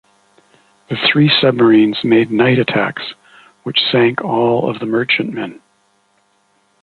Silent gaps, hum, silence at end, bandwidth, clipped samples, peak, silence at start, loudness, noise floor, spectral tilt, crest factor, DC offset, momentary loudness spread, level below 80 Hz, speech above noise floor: none; none; 1.3 s; 4.7 kHz; under 0.1%; 0 dBFS; 0.9 s; -13 LUFS; -59 dBFS; -7.5 dB/octave; 16 dB; under 0.1%; 15 LU; -58 dBFS; 45 dB